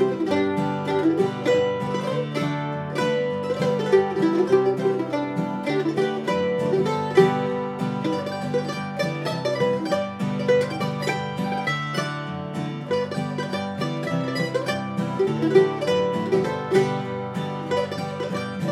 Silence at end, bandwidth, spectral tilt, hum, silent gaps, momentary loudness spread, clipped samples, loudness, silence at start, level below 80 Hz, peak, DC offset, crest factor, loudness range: 0 s; 13.5 kHz; -6.5 dB/octave; none; none; 8 LU; under 0.1%; -24 LUFS; 0 s; -68 dBFS; -4 dBFS; under 0.1%; 20 dB; 4 LU